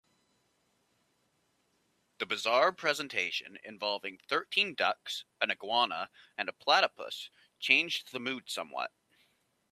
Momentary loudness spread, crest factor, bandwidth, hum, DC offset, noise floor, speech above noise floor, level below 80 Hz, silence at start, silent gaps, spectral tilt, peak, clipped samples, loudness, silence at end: 14 LU; 26 dB; 15 kHz; none; under 0.1%; -75 dBFS; 42 dB; -86 dBFS; 2.2 s; none; -1.5 dB/octave; -8 dBFS; under 0.1%; -31 LUFS; 0.85 s